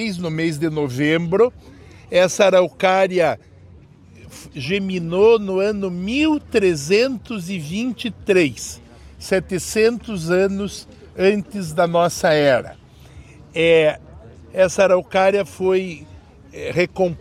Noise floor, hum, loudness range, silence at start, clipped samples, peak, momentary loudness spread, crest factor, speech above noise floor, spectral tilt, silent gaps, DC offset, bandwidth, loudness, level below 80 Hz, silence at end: -45 dBFS; none; 3 LU; 0 s; under 0.1%; -2 dBFS; 15 LU; 18 dB; 27 dB; -5 dB/octave; none; under 0.1%; 15.5 kHz; -18 LUFS; -48 dBFS; 0 s